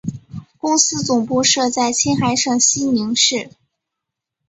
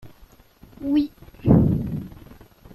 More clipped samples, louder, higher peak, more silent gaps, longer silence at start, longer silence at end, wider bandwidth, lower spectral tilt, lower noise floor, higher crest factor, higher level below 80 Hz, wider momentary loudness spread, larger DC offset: neither; first, -16 LUFS vs -22 LUFS; about the same, -2 dBFS vs -4 dBFS; neither; about the same, 0.05 s vs 0.05 s; first, 1 s vs 0.65 s; second, 8.2 kHz vs 12 kHz; second, -2.5 dB/octave vs -10 dB/octave; first, -81 dBFS vs -51 dBFS; about the same, 18 dB vs 20 dB; second, -54 dBFS vs -40 dBFS; second, 11 LU vs 16 LU; neither